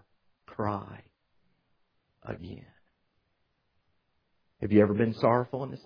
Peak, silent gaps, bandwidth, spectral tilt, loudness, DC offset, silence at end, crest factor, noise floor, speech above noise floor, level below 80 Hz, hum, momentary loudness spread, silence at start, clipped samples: -8 dBFS; none; 5.2 kHz; -10 dB/octave; -27 LUFS; under 0.1%; 0.1 s; 24 dB; -76 dBFS; 48 dB; -62 dBFS; none; 23 LU; 0.5 s; under 0.1%